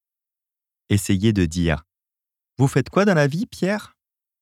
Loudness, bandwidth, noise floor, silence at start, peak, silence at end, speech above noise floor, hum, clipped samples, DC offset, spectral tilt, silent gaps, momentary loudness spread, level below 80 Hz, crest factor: -21 LUFS; 15.5 kHz; -89 dBFS; 0.9 s; -4 dBFS; 0.55 s; 69 dB; none; under 0.1%; under 0.1%; -6 dB/octave; none; 6 LU; -42 dBFS; 18 dB